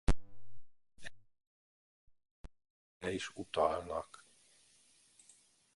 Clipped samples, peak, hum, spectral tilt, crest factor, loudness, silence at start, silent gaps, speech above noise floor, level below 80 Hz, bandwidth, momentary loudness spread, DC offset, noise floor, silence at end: under 0.1%; -18 dBFS; none; -5 dB/octave; 22 dB; -38 LUFS; 0.1 s; 1.47-2.07 s, 2.31-2.44 s, 2.70-3.00 s; 31 dB; -48 dBFS; 11.5 kHz; 27 LU; under 0.1%; -68 dBFS; 1.7 s